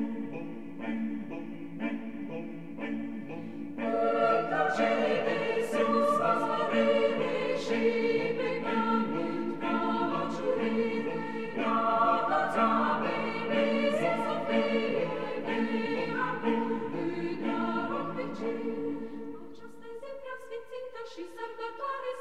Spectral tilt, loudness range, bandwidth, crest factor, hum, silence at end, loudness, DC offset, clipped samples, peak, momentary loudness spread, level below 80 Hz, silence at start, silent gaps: -6 dB/octave; 10 LU; 12.5 kHz; 16 dB; none; 0 s; -30 LUFS; 0.6%; under 0.1%; -14 dBFS; 15 LU; -76 dBFS; 0 s; none